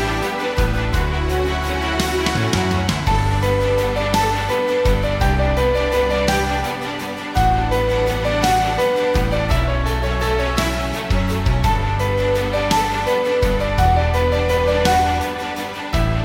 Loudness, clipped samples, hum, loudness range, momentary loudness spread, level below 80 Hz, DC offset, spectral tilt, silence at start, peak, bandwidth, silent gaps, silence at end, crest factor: -19 LUFS; under 0.1%; none; 2 LU; 4 LU; -24 dBFS; under 0.1%; -5.5 dB/octave; 0 s; -2 dBFS; 17 kHz; none; 0 s; 16 dB